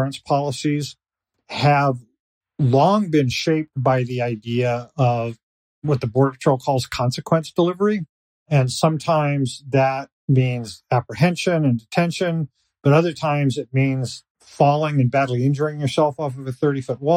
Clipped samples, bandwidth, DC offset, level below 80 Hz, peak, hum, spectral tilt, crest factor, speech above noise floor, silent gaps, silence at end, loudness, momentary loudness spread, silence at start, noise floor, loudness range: under 0.1%; 15 kHz; under 0.1%; -58 dBFS; -4 dBFS; none; -6.5 dB/octave; 16 dB; 43 dB; 2.20-2.41 s, 5.43-5.82 s, 8.09-8.46 s, 10.12-10.28 s, 14.30-14.35 s; 0 s; -20 LUFS; 9 LU; 0 s; -62 dBFS; 2 LU